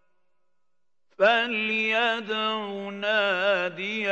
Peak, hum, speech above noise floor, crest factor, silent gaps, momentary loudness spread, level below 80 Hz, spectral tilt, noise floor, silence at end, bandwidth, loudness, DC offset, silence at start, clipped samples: -8 dBFS; none; 59 dB; 20 dB; none; 8 LU; -84 dBFS; -4 dB/octave; -84 dBFS; 0 s; 8.2 kHz; -24 LUFS; under 0.1%; 1.2 s; under 0.1%